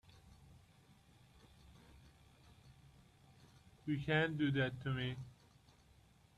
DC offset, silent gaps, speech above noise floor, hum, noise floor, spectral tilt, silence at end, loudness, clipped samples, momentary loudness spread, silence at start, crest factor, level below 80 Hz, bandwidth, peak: under 0.1%; none; 30 dB; none; -68 dBFS; -7 dB/octave; 1.05 s; -39 LUFS; under 0.1%; 28 LU; 0.1 s; 22 dB; -68 dBFS; 12.5 kHz; -22 dBFS